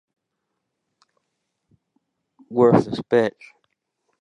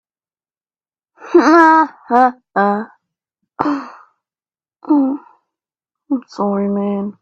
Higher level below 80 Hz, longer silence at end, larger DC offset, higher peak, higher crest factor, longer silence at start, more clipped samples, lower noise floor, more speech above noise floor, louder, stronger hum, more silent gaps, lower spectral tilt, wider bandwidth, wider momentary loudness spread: about the same, -62 dBFS vs -66 dBFS; first, 0.9 s vs 0.1 s; neither; about the same, -2 dBFS vs 0 dBFS; first, 24 dB vs 18 dB; first, 2.5 s vs 1.2 s; neither; second, -79 dBFS vs under -90 dBFS; second, 60 dB vs over 76 dB; second, -19 LUFS vs -15 LUFS; neither; neither; first, -8 dB/octave vs -6.5 dB/octave; first, 9.8 kHz vs 7.8 kHz; second, 10 LU vs 14 LU